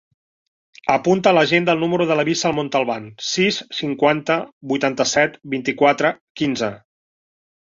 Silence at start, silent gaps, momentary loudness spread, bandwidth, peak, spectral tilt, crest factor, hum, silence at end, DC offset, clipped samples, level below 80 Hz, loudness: 0.85 s; 4.52-4.61 s, 6.21-6.35 s; 9 LU; 7.6 kHz; -2 dBFS; -4 dB/octave; 18 dB; none; 0.95 s; under 0.1%; under 0.1%; -60 dBFS; -19 LUFS